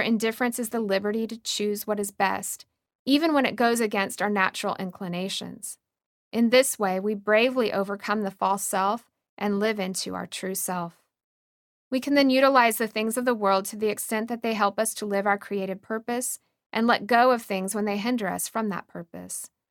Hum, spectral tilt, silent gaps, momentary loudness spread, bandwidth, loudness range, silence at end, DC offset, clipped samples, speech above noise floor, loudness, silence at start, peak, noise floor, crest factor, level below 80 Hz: none; -3.5 dB/octave; 2.95-3.06 s, 6.06-6.31 s, 9.29-9.37 s, 11.24-11.91 s, 16.66-16.70 s; 12 LU; 19 kHz; 4 LU; 0.25 s; under 0.1%; under 0.1%; over 65 dB; -25 LUFS; 0 s; -6 dBFS; under -90 dBFS; 20 dB; -72 dBFS